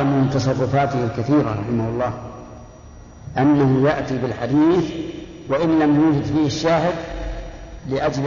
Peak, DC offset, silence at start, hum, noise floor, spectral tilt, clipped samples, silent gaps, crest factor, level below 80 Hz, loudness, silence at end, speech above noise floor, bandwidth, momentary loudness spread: -6 dBFS; under 0.1%; 0 s; none; -41 dBFS; -7.5 dB/octave; under 0.1%; none; 12 dB; -40 dBFS; -19 LUFS; 0 s; 22 dB; 7.4 kHz; 18 LU